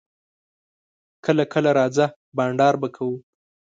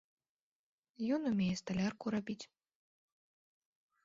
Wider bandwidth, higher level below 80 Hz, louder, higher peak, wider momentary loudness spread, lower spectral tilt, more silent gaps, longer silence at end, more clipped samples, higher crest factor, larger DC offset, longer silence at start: first, 9 kHz vs 7.6 kHz; about the same, -70 dBFS vs -72 dBFS; first, -21 LUFS vs -38 LUFS; first, -4 dBFS vs -24 dBFS; about the same, 10 LU vs 12 LU; about the same, -6.5 dB/octave vs -6 dB/octave; first, 2.16-2.32 s vs none; second, 0.6 s vs 1.6 s; neither; about the same, 20 dB vs 16 dB; neither; first, 1.25 s vs 1 s